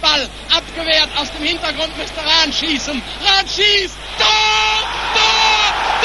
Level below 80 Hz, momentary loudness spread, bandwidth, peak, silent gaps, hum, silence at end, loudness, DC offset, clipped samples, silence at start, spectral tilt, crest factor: -36 dBFS; 8 LU; 11.5 kHz; 0 dBFS; none; 50 Hz at -35 dBFS; 0 s; -14 LUFS; 0.2%; under 0.1%; 0 s; -1 dB/octave; 16 dB